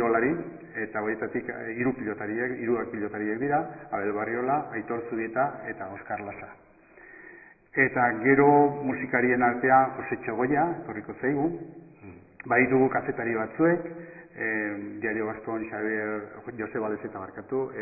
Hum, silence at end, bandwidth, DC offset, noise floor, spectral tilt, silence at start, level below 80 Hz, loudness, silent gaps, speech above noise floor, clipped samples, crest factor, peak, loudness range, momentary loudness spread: none; 0 s; 2.7 kHz; under 0.1%; -52 dBFS; -14 dB/octave; 0 s; -62 dBFS; -27 LUFS; none; 25 dB; under 0.1%; 20 dB; -6 dBFS; 8 LU; 16 LU